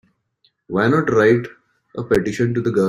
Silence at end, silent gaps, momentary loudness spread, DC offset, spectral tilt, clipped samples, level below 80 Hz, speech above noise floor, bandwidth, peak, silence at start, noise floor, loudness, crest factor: 0 s; none; 17 LU; under 0.1%; -7 dB/octave; under 0.1%; -50 dBFS; 47 dB; 13 kHz; -2 dBFS; 0.7 s; -64 dBFS; -18 LUFS; 16 dB